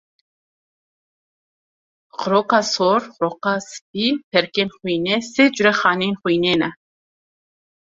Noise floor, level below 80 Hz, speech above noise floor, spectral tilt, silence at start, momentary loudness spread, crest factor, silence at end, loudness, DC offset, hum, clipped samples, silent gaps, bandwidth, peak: under -90 dBFS; -62 dBFS; over 71 dB; -4 dB/octave; 2.15 s; 9 LU; 20 dB; 1.2 s; -19 LUFS; under 0.1%; none; under 0.1%; 3.82-3.94 s, 4.23-4.31 s; 7.8 kHz; -2 dBFS